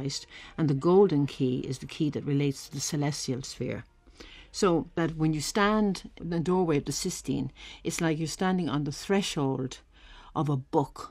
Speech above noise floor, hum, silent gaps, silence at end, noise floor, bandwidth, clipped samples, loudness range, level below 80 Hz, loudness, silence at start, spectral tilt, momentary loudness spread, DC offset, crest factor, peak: 22 dB; none; none; 0 s; -50 dBFS; 15.5 kHz; under 0.1%; 3 LU; -54 dBFS; -29 LUFS; 0 s; -5.5 dB/octave; 12 LU; under 0.1%; 18 dB; -10 dBFS